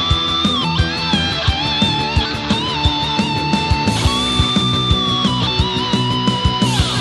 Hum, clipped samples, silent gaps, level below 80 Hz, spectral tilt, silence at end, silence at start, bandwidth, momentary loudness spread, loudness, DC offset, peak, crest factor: none; under 0.1%; none; -26 dBFS; -4.5 dB/octave; 0 s; 0 s; 12.5 kHz; 2 LU; -16 LUFS; under 0.1%; 0 dBFS; 16 dB